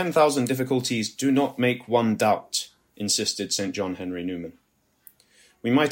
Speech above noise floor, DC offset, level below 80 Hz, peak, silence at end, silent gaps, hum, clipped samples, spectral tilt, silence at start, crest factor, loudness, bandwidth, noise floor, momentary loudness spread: 35 dB; under 0.1%; -68 dBFS; -6 dBFS; 0 s; none; none; under 0.1%; -4 dB/octave; 0 s; 18 dB; -24 LUFS; 16.5 kHz; -59 dBFS; 12 LU